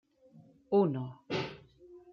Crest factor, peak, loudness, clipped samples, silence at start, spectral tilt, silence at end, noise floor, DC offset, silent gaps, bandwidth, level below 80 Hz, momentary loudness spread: 20 dB; -16 dBFS; -33 LUFS; under 0.1%; 0.35 s; -7.5 dB/octave; 0.15 s; -60 dBFS; under 0.1%; none; 7 kHz; -72 dBFS; 14 LU